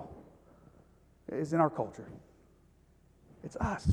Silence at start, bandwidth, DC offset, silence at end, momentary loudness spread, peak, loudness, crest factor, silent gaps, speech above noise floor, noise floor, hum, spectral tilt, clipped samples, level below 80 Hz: 0 s; 11 kHz; under 0.1%; 0 s; 23 LU; -14 dBFS; -34 LUFS; 24 dB; none; 32 dB; -64 dBFS; none; -8 dB/octave; under 0.1%; -56 dBFS